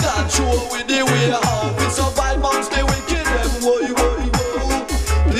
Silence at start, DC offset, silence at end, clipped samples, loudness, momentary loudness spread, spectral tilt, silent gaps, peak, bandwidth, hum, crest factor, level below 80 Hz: 0 s; under 0.1%; 0 s; under 0.1%; -18 LUFS; 4 LU; -4 dB/octave; none; -4 dBFS; 16 kHz; none; 14 dB; -24 dBFS